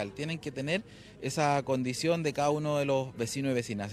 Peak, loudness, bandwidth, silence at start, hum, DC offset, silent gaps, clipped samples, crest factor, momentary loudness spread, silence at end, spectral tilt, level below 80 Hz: -14 dBFS; -31 LUFS; 15 kHz; 0 s; none; under 0.1%; none; under 0.1%; 18 dB; 7 LU; 0 s; -5 dB/octave; -64 dBFS